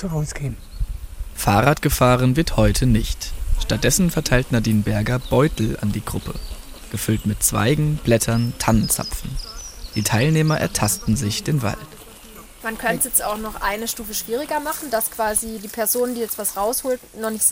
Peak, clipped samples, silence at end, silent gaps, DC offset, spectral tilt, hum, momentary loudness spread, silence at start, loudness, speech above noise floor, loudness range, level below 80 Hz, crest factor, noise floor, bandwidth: -2 dBFS; under 0.1%; 0 s; none; under 0.1%; -4.5 dB/octave; none; 14 LU; 0 s; -20 LUFS; 21 dB; 4 LU; -32 dBFS; 18 dB; -41 dBFS; 16.5 kHz